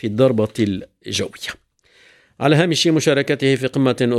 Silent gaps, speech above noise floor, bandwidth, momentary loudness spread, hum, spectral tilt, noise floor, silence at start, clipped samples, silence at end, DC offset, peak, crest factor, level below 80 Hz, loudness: none; 36 dB; 14.5 kHz; 12 LU; none; -5 dB/octave; -53 dBFS; 0.05 s; under 0.1%; 0 s; under 0.1%; -2 dBFS; 16 dB; -58 dBFS; -18 LUFS